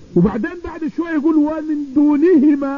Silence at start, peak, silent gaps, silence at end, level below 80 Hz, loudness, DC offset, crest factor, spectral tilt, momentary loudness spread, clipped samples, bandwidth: 0.1 s; -4 dBFS; none; 0 s; -44 dBFS; -16 LUFS; 0.4%; 12 dB; -9.5 dB/octave; 12 LU; under 0.1%; 5.4 kHz